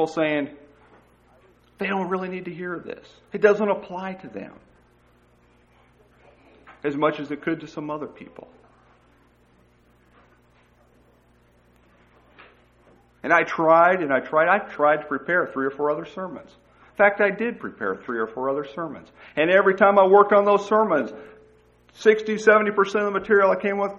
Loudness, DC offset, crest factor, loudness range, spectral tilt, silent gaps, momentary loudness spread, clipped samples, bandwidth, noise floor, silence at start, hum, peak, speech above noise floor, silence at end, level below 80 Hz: -21 LUFS; under 0.1%; 22 dB; 12 LU; -6 dB/octave; none; 18 LU; under 0.1%; 7.8 kHz; -58 dBFS; 0 s; 60 Hz at -60 dBFS; -2 dBFS; 37 dB; 0 s; -64 dBFS